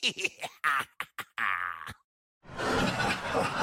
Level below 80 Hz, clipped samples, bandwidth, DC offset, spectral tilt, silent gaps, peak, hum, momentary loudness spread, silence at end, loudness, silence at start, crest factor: -54 dBFS; under 0.1%; 16.5 kHz; under 0.1%; -3.5 dB/octave; 2.04-2.41 s; -14 dBFS; none; 11 LU; 0 s; -31 LUFS; 0 s; 18 dB